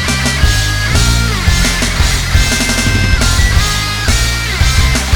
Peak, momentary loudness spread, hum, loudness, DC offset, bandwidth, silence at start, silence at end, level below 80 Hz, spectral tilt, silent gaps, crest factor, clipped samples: 0 dBFS; 2 LU; none; -12 LUFS; under 0.1%; 19.5 kHz; 0 s; 0 s; -14 dBFS; -3 dB/octave; none; 12 dB; under 0.1%